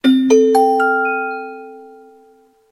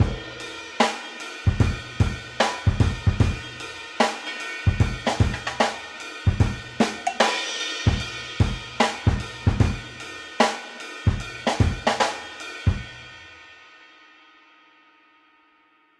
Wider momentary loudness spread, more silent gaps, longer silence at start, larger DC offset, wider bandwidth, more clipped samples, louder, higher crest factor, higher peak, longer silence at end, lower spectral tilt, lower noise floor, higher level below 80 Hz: first, 18 LU vs 12 LU; neither; about the same, 0.05 s vs 0 s; neither; about the same, 12 kHz vs 12 kHz; neither; first, -14 LUFS vs -25 LUFS; about the same, 16 dB vs 20 dB; first, 0 dBFS vs -4 dBFS; second, 0.85 s vs 2.15 s; second, -3.5 dB/octave vs -5 dB/octave; second, -51 dBFS vs -60 dBFS; second, -68 dBFS vs -34 dBFS